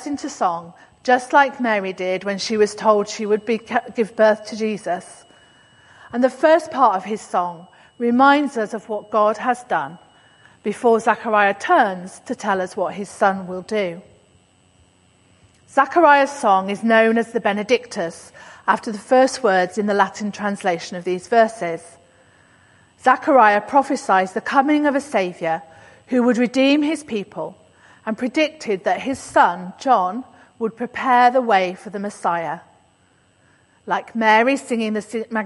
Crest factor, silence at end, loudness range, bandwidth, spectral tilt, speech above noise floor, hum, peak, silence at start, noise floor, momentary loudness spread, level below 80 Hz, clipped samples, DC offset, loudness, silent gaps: 18 dB; 0 s; 4 LU; 11.5 kHz; -4.5 dB/octave; 39 dB; none; 0 dBFS; 0 s; -58 dBFS; 13 LU; -64 dBFS; under 0.1%; under 0.1%; -19 LUFS; none